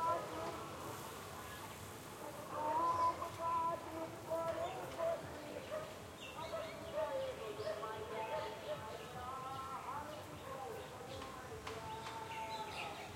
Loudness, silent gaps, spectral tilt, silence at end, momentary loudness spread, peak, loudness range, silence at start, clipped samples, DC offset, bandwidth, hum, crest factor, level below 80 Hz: -44 LUFS; none; -4 dB/octave; 0 s; 10 LU; -26 dBFS; 7 LU; 0 s; under 0.1%; under 0.1%; 16.5 kHz; none; 18 dB; -70 dBFS